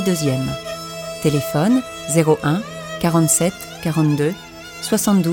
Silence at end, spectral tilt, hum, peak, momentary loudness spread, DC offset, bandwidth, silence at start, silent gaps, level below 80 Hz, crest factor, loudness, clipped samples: 0 s; -5 dB/octave; none; -2 dBFS; 13 LU; under 0.1%; 17.5 kHz; 0 s; none; -48 dBFS; 16 dB; -19 LUFS; under 0.1%